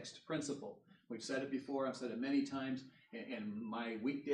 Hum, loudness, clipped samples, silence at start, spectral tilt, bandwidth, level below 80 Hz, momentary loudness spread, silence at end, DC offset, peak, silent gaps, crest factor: none; -42 LUFS; under 0.1%; 0 s; -5 dB/octave; 10.5 kHz; -88 dBFS; 14 LU; 0 s; under 0.1%; -26 dBFS; none; 16 dB